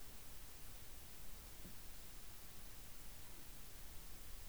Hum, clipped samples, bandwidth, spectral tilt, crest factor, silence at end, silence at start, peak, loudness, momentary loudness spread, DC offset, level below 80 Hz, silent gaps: none; under 0.1%; over 20 kHz; -2.5 dB/octave; 14 dB; 0 s; 0 s; -38 dBFS; -54 LUFS; 0 LU; 0.2%; -58 dBFS; none